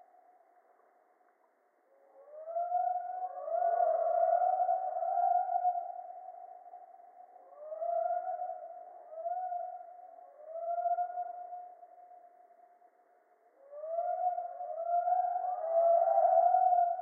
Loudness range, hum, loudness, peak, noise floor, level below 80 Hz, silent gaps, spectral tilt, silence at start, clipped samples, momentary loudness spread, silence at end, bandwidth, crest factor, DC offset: 10 LU; none; -32 LUFS; -16 dBFS; -71 dBFS; under -90 dBFS; none; 10 dB/octave; 2.2 s; under 0.1%; 24 LU; 0 s; 2.2 kHz; 18 dB; under 0.1%